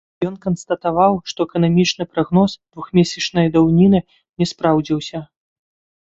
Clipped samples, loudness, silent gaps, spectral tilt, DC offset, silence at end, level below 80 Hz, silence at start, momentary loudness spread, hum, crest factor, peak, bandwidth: under 0.1%; -17 LUFS; 4.29-4.33 s; -6.5 dB/octave; under 0.1%; 0.8 s; -48 dBFS; 0.2 s; 10 LU; none; 16 dB; -2 dBFS; 7.8 kHz